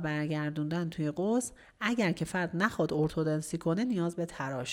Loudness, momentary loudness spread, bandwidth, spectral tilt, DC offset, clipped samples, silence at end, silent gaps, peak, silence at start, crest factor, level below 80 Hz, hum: -32 LUFS; 5 LU; 16 kHz; -6 dB/octave; under 0.1%; under 0.1%; 0 s; none; -12 dBFS; 0 s; 18 dB; -60 dBFS; none